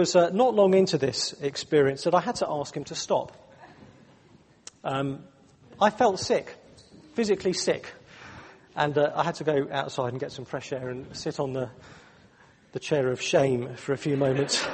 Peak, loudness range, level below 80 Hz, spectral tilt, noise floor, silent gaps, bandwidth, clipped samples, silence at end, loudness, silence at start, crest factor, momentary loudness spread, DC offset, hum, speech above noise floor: -8 dBFS; 7 LU; -64 dBFS; -4.5 dB/octave; -57 dBFS; none; 8.8 kHz; under 0.1%; 0 s; -26 LUFS; 0 s; 20 dB; 15 LU; under 0.1%; none; 31 dB